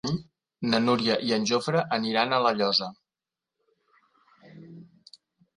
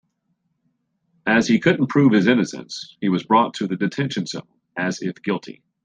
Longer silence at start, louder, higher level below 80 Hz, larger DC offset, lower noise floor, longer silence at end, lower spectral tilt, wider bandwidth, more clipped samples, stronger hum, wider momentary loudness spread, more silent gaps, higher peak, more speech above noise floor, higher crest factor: second, 0.05 s vs 1.25 s; second, -25 LUFS vs -20 LUFS; about the same, -66 dBFS vs -62 dBFS; neither; first, -90 dBFS vs -71 dBFS; first, 0.75 s vs 0.3 s; second, -4.5 dB/octave vs -6 dB/octave; first, 11.5 kHz vs 9.4 kHz; neither; neither; about the same, 11 LU vs 13 LU; neither; second, -8 dBFS vs -2 dBFS; first, 65 dB vs 51 dB; about the same, 22 dB vs 20 dB